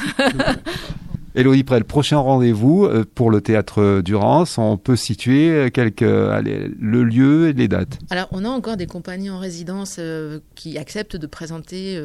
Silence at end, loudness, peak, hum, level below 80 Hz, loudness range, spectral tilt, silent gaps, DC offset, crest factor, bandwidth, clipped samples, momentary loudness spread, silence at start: 0 s; -18 LUFS; -2 dBFS; none; -42 dBFS; 10 LU; -6.5 dB/octave; none; under 0.1%; 14 dB; 13 kHz; under 0.1%; 15 LU; 0 s